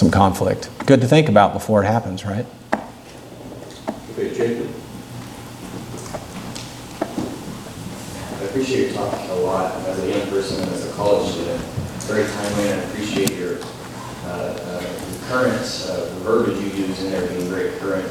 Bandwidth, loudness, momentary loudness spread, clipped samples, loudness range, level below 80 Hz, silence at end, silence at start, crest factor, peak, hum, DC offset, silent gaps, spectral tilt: 18.5 kHz; -22 LUFS; 16 LU; under 0.1%; 10 LU; -48 dBFS; 0 s; 0 s; 22 dB; 0 dBFS; none; under 0.1%; none; -5.5 dB/octave